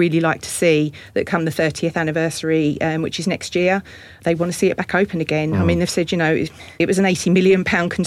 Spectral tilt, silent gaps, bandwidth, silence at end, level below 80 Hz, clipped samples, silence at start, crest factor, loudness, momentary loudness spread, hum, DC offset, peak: -5.5 dB/octave; none; 15.5 kHz; 0 s; -48 dBFS; under 0.1%; 0 s; 14 dB; -19 LUFS; 6 LU; none; under 0.1%; -6 dBFS